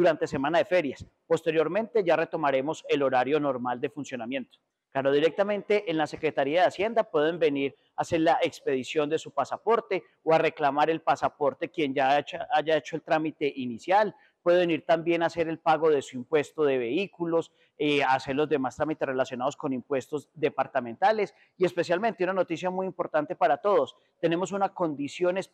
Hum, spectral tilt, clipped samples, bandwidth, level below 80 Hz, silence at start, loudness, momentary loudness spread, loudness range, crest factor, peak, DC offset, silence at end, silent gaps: none; -5.5 dB/octave; under 0.1%; 10 kHz; -68 dBFS; 0 s; -27 LUFS; 7 LU; 2 LU; 16 dB; -12 dBFS; under 0.1%; 0.1 s; none